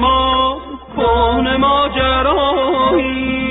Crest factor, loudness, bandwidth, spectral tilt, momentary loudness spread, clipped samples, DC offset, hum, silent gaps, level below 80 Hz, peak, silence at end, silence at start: 12 dB; -14 LUFS; 4 kHz; -2.5 dB/octave; 5 LU; under 0.1%; under 0.1%; none; none; -28 dBFS; -2 dBFS; 0 s; 0 s